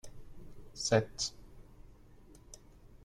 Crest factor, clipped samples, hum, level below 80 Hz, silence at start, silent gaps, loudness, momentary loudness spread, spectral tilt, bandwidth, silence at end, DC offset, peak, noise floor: 26 dB; under 0.1%; none; -56 dBFS; 0.05 s; none; -33 LUFS; 26 LU; -4 dB/octave; 14.5 kHz; 0 s; under 0.1%; -14 dBFS; -57 dBFS